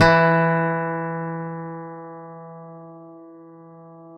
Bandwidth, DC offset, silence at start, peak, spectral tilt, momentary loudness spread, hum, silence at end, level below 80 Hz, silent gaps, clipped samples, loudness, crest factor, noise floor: 8.2 kHz; under 0.1%; 0 s; -2 dBFS; -7 dB/octave; 27 LU; none; 0 s; -50 dBFS; none; under 0.1%; -21 LUFS; 22 dB; -44 dBFS